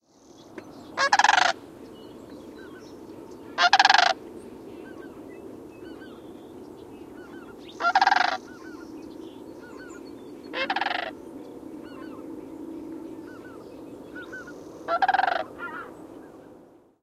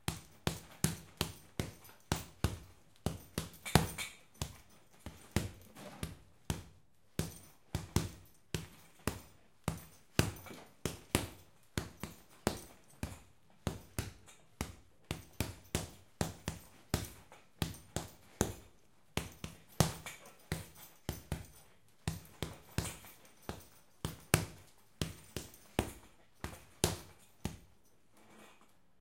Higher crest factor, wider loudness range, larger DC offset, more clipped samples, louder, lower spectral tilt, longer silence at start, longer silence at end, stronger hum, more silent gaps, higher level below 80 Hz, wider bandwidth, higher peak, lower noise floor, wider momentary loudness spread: second, 28 dB vs 40 dB; first, 16 LU vs 6 LU; neither; neither; first, -23 LUFS vs -41 LUFS; second, -1.5 dB/octave vs -4 dB/octave; first, 0.55 s vs 0.1 s; about the same, 0.5 s vs 0.5 s; neither; neither; second, -66 dBFS vs -54 dBFS; second, 14.5 kHz vs 16.5 kHz; about the same, -2 dBFS vs -2 dBFS; second, -53 dBFS vs -69 dBFS; first, 24 LU vs 20 LU